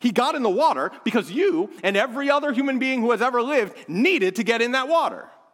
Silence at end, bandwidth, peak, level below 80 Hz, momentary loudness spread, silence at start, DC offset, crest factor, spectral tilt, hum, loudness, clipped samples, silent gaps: 0.25 s; 16.5 kHz; -4 dBFS; -80 dBFS; 4 LU; 0 s; under 0.1%; 16 dB; -4.5 dB/octave; none; -22 LUFS; under 0.1%; none